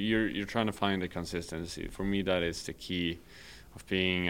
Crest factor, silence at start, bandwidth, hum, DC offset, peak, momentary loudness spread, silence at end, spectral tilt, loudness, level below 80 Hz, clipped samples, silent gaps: 22 dB; 0 s; 17 kHz; none; 0.1%; -12 dBFS; 15 LU; 0 s; -5 dB/octave; -33 LUFS; -52 dBFS; under 0.1%; none